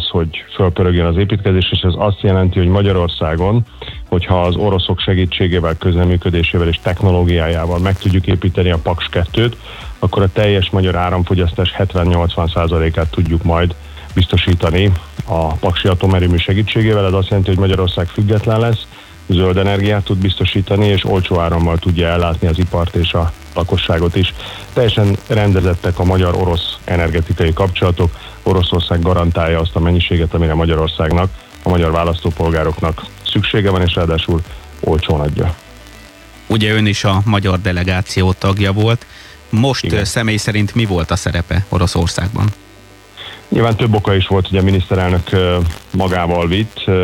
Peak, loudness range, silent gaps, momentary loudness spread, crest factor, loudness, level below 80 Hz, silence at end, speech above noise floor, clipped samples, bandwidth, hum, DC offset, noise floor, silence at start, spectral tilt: -2 dBFS; 2 LU; none; 5 LU; 12 dB; -15 LUFS; -26 dBFS; 0 s; 27 dB; under 0.1%; 12.5 kHz; none; under 0.1%; -40 dBFS; 0 s; -6.5 dB/octave